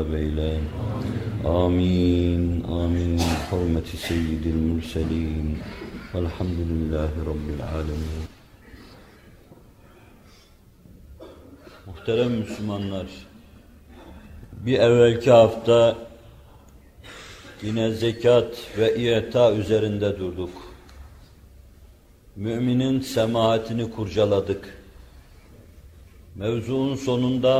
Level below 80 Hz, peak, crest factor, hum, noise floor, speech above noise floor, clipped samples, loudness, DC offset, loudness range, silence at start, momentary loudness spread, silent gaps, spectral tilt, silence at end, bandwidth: -40 dBFS; -2 dBFS; 22 dB; none; -52 dBFS; 30 dB; under 0.1%; -23 LUFS; under 0.1%; 10 LU; 0 s; 18 LU; none; -7 dB/octave; 0 s; 15 kHz